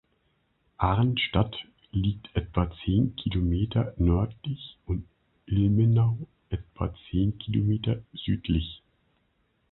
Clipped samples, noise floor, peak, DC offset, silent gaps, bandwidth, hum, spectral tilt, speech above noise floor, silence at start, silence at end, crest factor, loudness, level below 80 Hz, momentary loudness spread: under 0.1%; -71 dBFS; -8 dBFS; under 0.1%; none; 4.1 kHz; none; -11.5 dB/octave; 45 dB; 0.8 s; 0.95 s; 20 dB; -28 LUFS; -38 dBFS; 12 LU